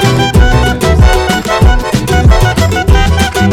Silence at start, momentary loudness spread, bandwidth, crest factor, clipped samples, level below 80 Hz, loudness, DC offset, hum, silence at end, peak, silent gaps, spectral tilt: 0 s; 3 LU; 16 kHz; 8 dB; 0.5%; -12 dBFS; -9 LUFS; under 0.1%; none; 0 s; 0 dBFS; none; -5.5 dB/octave